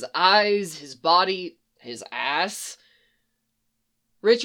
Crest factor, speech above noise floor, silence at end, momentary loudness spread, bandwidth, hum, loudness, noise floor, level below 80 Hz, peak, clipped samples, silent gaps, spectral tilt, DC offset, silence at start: 22 dB; 52 dB; 0 s; 19 LU; 17.5 kHz; none; -22 LUFS; -76 dBFS; -80 dBFS; -2 dBFS; under 0.1%; none; -2.5 dB/octave; under 0.1%; 0 s